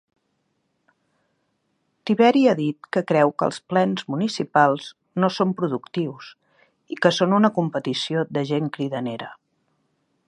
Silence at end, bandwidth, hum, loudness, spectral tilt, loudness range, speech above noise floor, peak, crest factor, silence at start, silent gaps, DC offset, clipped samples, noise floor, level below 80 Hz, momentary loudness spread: 0.95 s; 10.5 kHz; none; -22 LUFS; -6 dB/octave; 3 LU; 51 dB; -2 dBFS; 20 dB; 2.05 s; none; under 0.1%; under 0.1%; -72 dBFS; -72 dBFS; 12 LU